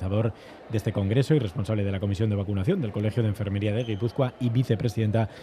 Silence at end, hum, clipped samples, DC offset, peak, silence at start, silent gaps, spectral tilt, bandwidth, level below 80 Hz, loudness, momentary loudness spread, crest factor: 0 s; none; under 0.1%; under 0.1%; -8 dBFS; 0 s; none; -8 dB/octave; 13 kHz; -56 dBFS; -27 LUFS; 4 LU; 16 dB